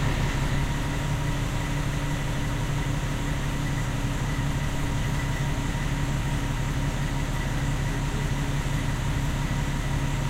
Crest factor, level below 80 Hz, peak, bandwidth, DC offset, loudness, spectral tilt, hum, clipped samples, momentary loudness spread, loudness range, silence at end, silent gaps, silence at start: 14 dB; -30 dBFS; -12 dBFS; 16 kHz; 0.2%; -28 LUFS; -5.5 dB/octave; none; under 0.1%; 1 LU; 0 LU; 0 s; none; 0 s